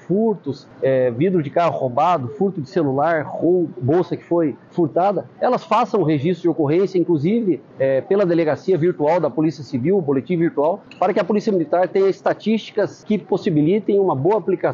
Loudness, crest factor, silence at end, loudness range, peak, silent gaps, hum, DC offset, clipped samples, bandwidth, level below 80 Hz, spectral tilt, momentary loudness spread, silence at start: -19 LUFS; 14 dB; 0 s; 1 LU; -4 dBFS; none; none; under 0.1%; under 0.1%; 7.4 kHz; -62 dBFS; -8.5 dB/octave; 4 LU; 0.1 s